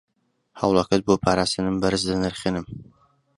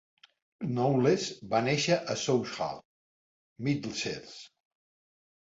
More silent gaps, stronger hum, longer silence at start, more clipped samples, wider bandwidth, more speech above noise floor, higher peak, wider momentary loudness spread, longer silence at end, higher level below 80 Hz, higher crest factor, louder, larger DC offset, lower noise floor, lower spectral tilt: second, none vs 2.85-3.56 s; neither; about the same, 0.55 s vs 0.6 s; neither; first, 11.5 kHz vs 8 kHz; second, 37 dB vs over 61 dB; first, -4 dBFS vs -14 dBFS; second, 10 LU vs 14 LU; second, 0.55 s vs 1.1 s; first, -46 dBFS vs -68 dBFS; about the same, 20 dB vs 18 dB; first, -23 LUFS vs -30 LUFS; neither; second, -59 dBFS vs under -90 dBFS; about the same, -5 dB/octave vs -5 dB/octave